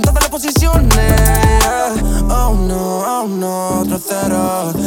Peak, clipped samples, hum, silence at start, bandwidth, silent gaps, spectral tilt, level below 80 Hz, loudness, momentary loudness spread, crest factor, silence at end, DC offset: 0 dBFS; under 0.1%; none; 0 s; 18.5 kHz; none; -5 dB/octave; -16 dBFS; -14 LUFS; 6 LU; 12 dB; 0 s; under 0.1%